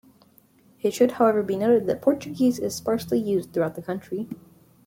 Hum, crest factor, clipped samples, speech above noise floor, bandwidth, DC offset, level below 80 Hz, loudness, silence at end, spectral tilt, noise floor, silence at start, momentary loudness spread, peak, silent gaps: none; 18 dB; under 0.1%; 34 dB; 16.5 kHz; under 0.1%; -64 dBFS; -24 LUFS; 0.5 s; -6 dB/octave; -58 dBFS; 0.85 s; 12 LU; -6 dBFS; none